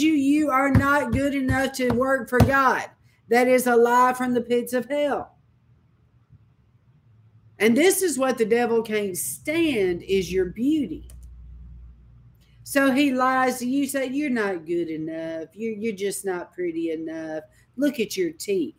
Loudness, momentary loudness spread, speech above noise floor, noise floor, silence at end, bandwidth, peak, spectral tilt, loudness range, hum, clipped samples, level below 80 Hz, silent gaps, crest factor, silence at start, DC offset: -23 LUFS; 12 LU; 37 dB; -60 dBFS; 0.1 s; 16 kHz; -2 dBFS; -5 dB/octave; 8 LU; none; under 0.1%; -46 dBFS; none; 22 dB; 0 s; under 0.1%